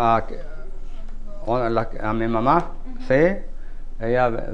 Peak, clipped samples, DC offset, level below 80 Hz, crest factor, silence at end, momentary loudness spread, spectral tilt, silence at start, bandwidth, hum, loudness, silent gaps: -4 dBFS; under 0.1%; 2%; -30 dBFS; 18 dB; 0 s; 22 LU; -8 dB/octave; 0 s; 6.2 kHz; none; -22 LUFS; none